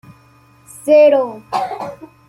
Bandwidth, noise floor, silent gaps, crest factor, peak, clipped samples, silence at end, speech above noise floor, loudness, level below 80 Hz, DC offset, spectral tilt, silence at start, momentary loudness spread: 14 kHz; -49 dBFS; none; 14 dB; -2 dBFS; under 0.1%; 0.25 s; 35 dB; -14 LUFS; -60 dBFS; under 0.1%; -5 dB/octave; 0.85 s; 18 LU